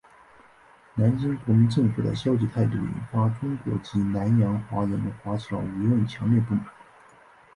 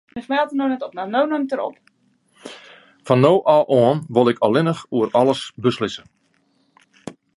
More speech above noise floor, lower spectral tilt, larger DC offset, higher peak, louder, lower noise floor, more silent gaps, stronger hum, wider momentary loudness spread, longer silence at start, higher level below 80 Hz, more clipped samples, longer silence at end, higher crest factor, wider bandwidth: second, 31 dB vs 45 dB; first, -9 dB/octave vs -7 dB/octave; neither; second, -10 dBFS vs 0 dBFS; second, -25 LUFS vs -19 LUFS; second, -54 dBFS vs -63 dBFS; neither; neither; second, 8 LU vs 22 LU; first, 0.95 s vs 0.15 s; first, -52 dBFS vs -62 dBFS; neither; first, 0.85 s vs 0.25 s; about the same, 16 dB vs 20 dB; about the same, 10.5 kHz vs 11.5 kHz